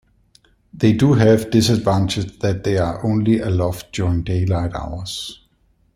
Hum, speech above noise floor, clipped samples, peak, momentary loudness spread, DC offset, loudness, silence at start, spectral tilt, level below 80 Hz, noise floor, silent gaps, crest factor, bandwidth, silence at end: none; 42 dB; under 0.1%; -2 dBFS; 13 LU; under 0.1%; -18 LUFS; 0.75 s; -6.5 dB/octave; -40 dBFS; -60 dBFS; none; 16 dB; 15 kHz; 0.6 s